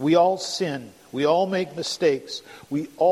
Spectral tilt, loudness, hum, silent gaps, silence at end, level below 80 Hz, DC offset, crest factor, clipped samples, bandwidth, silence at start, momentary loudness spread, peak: -5 dB/octave; -24 LUFS; none; none; 0 s; -68 dBFS; under 0.1%; 16 dB; under 0.1%; 14.5 kHz; 0 s; 15 LU; -6 dBFS